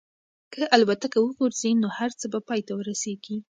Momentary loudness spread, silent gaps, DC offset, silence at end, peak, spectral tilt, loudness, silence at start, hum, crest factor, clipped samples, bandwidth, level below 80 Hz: 11 LU; none; under 0.1%; 0.15 s; -2 dBFS; -4 dB/octave; -25 LUFS; 0.5 s; none; 24 dB; under 0.1%; 9.4 kHz; -74 dBFS